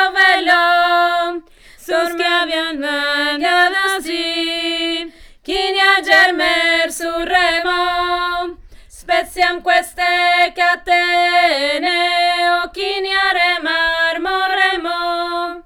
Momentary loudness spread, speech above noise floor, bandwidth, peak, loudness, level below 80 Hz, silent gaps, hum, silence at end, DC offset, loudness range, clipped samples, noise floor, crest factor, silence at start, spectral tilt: 8 LU; 25 dB; 18 kHz; 0 dBFS; -15 LUFS; -46 dBFS; none; none; 0.05 s; under 0.1%; 3 LU; under 0.1%; -40 dBFS; 16 dB; 0 s; -1 dB/octave